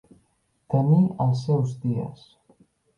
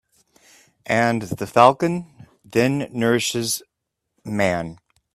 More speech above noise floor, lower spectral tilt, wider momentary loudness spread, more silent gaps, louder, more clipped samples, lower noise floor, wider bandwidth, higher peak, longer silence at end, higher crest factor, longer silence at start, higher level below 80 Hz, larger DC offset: second, 46 dB vs 60 dB; first, -10 dB/octave vs -4.5 dB/octave; second, 10 LU vs 14 LU; neither; second, -23 LUFS vs -20 LUFS; neither; second, -69 dBFS vs -79 dBFS; second, 7.4 kHz vs 15.5 kHz; second, -8 dBFS vs 0 dBFS; first, 0.85 s vs 0.4 s; second, 16 dB vs 22 dB; second, 0.7 s vs 0.85 s; about the same, -62 dBFS vs -58 dBFS; neither